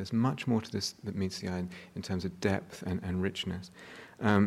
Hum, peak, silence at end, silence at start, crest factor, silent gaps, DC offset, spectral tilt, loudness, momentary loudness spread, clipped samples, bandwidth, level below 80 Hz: none; -12 dBFS; 0 s; 0 s; 20 dB; none; under 0.1%; -6 dB/octave; -34 LUFS; 12 LU; under 0.1%; 14.5 kHz; -60 dBFS